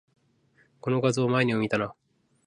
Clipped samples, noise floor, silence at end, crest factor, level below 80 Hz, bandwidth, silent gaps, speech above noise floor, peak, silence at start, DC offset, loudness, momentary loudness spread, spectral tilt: under 0.1%; -65 dBFS; 0.55 s; 18 dB; -66 dBFS; 11 kHz; none; 40 dB; -10 dBFS; 0.85 s; under 0.1%; -26 LUFS; 10 LU; -6 dB/octave